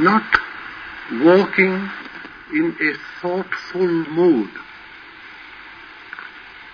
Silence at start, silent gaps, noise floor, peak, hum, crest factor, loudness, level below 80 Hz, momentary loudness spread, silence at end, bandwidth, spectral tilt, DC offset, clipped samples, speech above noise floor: 0 s; none; -40 dBFS; 0 dBFS; none; 20 dB; -18 LUFS; -56 dBFS; 23 LU; 0 s; 5.4 kHz; -7.5 dB/octave; under 0.1%; under 0.1%; 22 dB